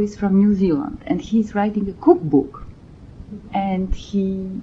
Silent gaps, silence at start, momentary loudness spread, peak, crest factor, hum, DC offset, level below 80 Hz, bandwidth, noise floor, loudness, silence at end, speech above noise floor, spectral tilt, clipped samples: none; 0 s; 12 LU; -2 dBFS; 18 dB; none; under 0.1%; -38 dBFS; 7.4 kHz; -41 dBFS; -20 LUFS; 0 s; 22 dB; -8.5 dB/octave; under 0.1%